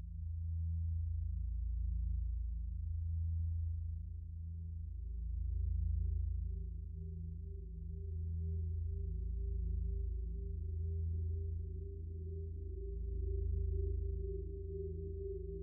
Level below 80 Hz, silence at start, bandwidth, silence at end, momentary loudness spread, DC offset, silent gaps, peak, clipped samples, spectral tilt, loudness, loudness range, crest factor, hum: -42 dBFS; 0 s; 0.5 kHz; 0 s; 7 LU; under 0.1%; none; -28 dBFS; under 0.1%; -9.5 dB/octave; -42 LUFS; 2 LU; 10 dB; none